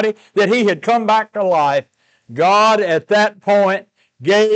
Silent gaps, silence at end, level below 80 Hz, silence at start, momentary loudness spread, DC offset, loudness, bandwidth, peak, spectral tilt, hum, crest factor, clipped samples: none; 0 s; -74 dBFS; 0 s; 7 LU; under 0.1%; -15 LUFS; 8.8 kHz; -6 dBFS; -4.5 dB/octave; none; 10 dB; under 0.1%